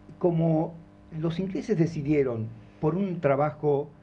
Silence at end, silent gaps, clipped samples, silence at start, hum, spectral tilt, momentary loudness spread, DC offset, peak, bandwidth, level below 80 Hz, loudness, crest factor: 0.1 s; none; under 0.1%; 0.1 s; none; -9 dB/octave; 9 LU; under 0.1%; -10 dBFS; 7 kHz; -56 dBFS; -27 LUFS; 16 dB